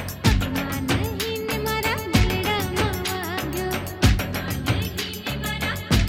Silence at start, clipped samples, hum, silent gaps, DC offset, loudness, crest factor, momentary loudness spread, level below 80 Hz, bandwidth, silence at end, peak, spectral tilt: 0 s; under 0.1%; none; none; under 0.1%; -24 LUFS; 20 dB; 6 LU; -30 dBFS; 17.5 kHz; 0 s; -4 dBFS; -4.5 dB/octave